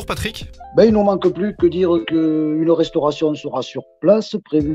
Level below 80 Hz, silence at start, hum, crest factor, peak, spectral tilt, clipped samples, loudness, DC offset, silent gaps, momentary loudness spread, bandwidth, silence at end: -40 dBFS; 0 s; none; 16 dB; 0 dBFS; -7 dB/octave; under 0.1%; -17 LUFS; under 0.1%; none; 11 LU; 14 kHz; 0 s